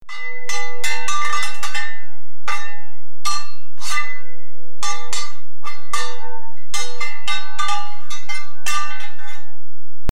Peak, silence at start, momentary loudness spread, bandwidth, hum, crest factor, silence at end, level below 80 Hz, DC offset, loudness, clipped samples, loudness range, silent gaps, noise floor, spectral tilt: -2 dBFS; 0 s; 15 LU; 17 kHz; none; 16 dB; 0 s; -64 dBFS; 50%; -26 LUFS; under 0.1%; 3 LU; none; -59 dBFS; -1.5 dB/octave